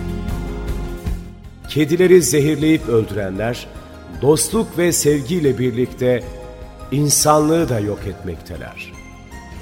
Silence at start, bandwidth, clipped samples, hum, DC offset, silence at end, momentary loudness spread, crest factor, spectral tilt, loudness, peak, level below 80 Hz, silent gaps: 0 s; 16.5 kHz; under 0.1%; none; under 0.1%; 0 s; 23 LU; 18 dB; -5 dB/octave; -17 LUFS; 0 dBFS; -34 dBFS; none